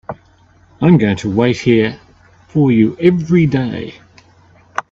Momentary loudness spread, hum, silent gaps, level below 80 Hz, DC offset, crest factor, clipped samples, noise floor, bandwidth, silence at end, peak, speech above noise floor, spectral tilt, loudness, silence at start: 15 LU; none; none; -48 dBFS; under 0.1%; 16 dB; under 0.1%; -49 dBFS; 7.6 kHz; 0.1 s; 0 dBFS; 36 dB; -8 dB/octave; -14 LUFS; 0.1 s